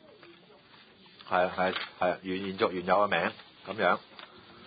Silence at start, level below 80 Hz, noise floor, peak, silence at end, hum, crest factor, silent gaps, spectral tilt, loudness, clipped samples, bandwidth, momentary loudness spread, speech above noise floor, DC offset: 0.25 s; -66 dBFS; -57 dBFS; -12 dBFS; 0 s; none; 20 dB; none; -8.5 dB/octave; -30 LUFS; under 0.1%; 5 kHz; 21 LU; 27 dB; under 0.1%